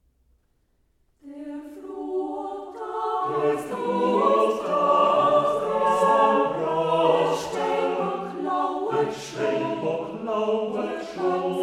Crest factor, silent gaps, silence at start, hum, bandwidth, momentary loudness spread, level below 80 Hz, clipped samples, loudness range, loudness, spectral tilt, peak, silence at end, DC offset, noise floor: 16 dB; none; 1.25 s; none; 14 kHz; 13 LU; -64 dBFS; under 0.1%; 9 LU; -24 LUFS; -5.5 dB/octave; -8 dBFS; 0 s; under 0.1%; -67 dBFS